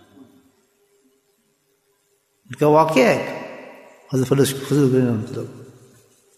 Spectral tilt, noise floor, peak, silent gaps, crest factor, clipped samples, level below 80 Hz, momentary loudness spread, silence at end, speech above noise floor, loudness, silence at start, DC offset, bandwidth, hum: -6 dB/octave; -65 dBFS; -4 dBFS; none; 18 dB; under 0.1%; -62 dBFS; 21 LU; 0.7 s; 48 dB; -19 LUFS; 0.2 s; under 0.1%; 14 kHz; none